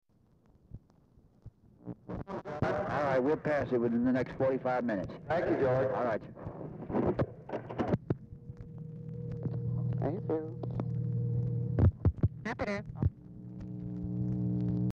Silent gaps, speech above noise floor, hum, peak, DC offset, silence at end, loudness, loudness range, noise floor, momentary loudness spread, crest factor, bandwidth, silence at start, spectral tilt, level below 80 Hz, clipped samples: none; 35 dB; none; -16 dBFS; under 0.1%; 0 s; -33 LUFS; 6 LU; -66 dBFS; 15 LU; 18 dB; 6.8 kHz; 0.75 s; -9.5 dB/octave; -48 dBFS; under 0.1%